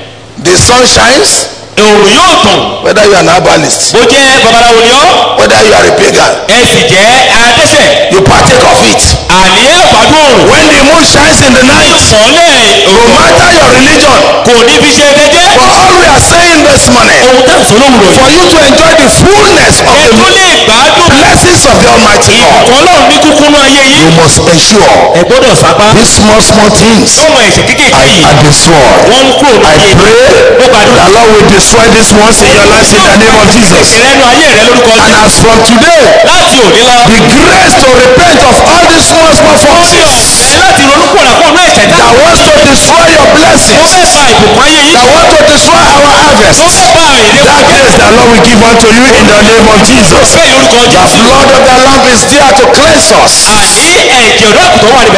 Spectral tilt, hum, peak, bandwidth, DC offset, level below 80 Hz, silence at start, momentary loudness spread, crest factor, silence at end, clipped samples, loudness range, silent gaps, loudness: -3 dB/octave; none; 0 dBFS; 11 kHz; 5%; -22 dBFS; 0 s; 2 LU; 2 dB; 0 s; 50%; 1 LU; none; -1 LUFS